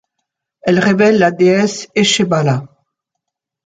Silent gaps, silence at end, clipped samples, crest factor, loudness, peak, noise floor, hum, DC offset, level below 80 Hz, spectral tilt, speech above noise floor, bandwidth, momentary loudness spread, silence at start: none; 1 s; under 0.1%; 14 dB; -13 LUFS; 0 dBFS; -78 dBFS; none; under 0.1%; -56 dBFS; -5 dB/octave; 66 dB; 9.4 kHz; 7 LU; 0.65 s